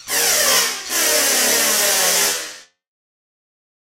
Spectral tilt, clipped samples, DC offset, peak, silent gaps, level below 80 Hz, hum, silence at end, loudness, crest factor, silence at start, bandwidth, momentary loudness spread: 1.5 dB/octave; under 0.1%; under 0.1%; -4 dBFS; none; -56 dBFS; none; 1.35 s; -14 LUFS; 16 dB; 0.05 s; 16 kHz; 5 LU